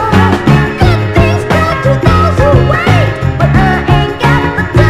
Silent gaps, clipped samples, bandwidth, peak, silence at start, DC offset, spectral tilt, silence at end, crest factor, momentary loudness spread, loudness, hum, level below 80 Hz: none; 1%; 14 kHz; 0 dBFS; 0 s; under 0.1%; -7 dB/octave; 0 s; 8 dB; 3 LU; -9 LUFS; none; -20 dBFS